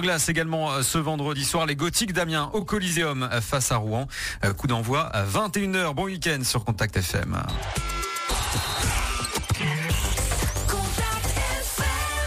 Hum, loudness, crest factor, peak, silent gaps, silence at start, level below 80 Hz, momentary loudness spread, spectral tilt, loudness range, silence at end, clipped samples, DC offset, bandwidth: none; -25 LUFS; 16 dB; -10 dBFS; none; 0 s; -34 dBFS; 4 LU; -3.5 dB/octave; 2 LU; 0 s; under 0.1%; under 0.1%; 15.5 kHz